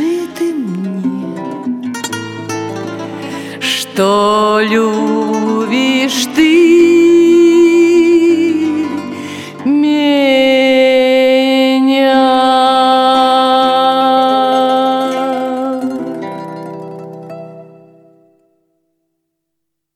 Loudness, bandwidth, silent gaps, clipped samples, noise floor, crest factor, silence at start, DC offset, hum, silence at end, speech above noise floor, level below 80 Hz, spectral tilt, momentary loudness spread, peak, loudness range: -11 LUFS; 15 kHz; none; under 0.1%; -75 dBFS; 12 dB; 0 s; under 0.1%; none; 2.3 s; 65 dB; -58 dBFS; -4.5 dB/octave; 16 LU; 0 dBFS; 11 LU